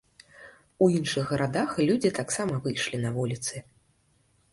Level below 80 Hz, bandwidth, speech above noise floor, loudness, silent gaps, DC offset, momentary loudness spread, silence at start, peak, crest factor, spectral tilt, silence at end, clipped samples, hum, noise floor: -60 dBFS; 11.5 kHz; 40 dB; -27 LUFS; none; under 0.1%; 7 LU; 0.4 s; -8 dBFS; 20 dB; -5 dB/octave; 0.9 s; under 0.1%; none; -67 dBFS